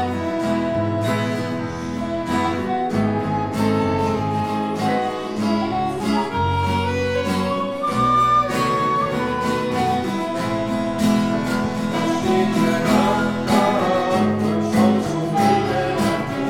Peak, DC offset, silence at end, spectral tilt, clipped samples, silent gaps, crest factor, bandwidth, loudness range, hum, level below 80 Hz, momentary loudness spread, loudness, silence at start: -4 dBFS; under 0.1%; 0 s; -6 dB/octave; under 0.1%; none; 16 dB; 17 kHz; 3 LU; none; -46 dBFS; 6 LU; -20 LUFS; 0 s